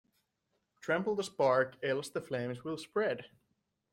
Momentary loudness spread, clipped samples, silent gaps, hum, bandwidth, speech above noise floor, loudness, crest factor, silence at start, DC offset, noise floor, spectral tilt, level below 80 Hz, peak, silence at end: 10 LU; under 0.1%; none; none; 16.5 kHz; 48 dB; -34 LUFS; 18 dB; 0.85 s; under 0.1%; -82 dBFS; -5 dB/octave; -78 dBFS; -16 dBFS; 0.65 s